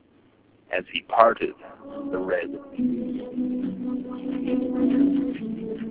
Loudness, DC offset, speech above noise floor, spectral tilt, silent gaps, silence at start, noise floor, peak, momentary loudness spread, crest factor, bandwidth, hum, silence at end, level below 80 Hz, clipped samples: -26 LUFS; under 0.1%; 34 dB; -4 dB/octave; none; 0.7 s; -58 dBFS; 0 dBFS; 12 LU; 24 dB; 4 kHz; none; 0 s; -58 dBFS; under 0.1%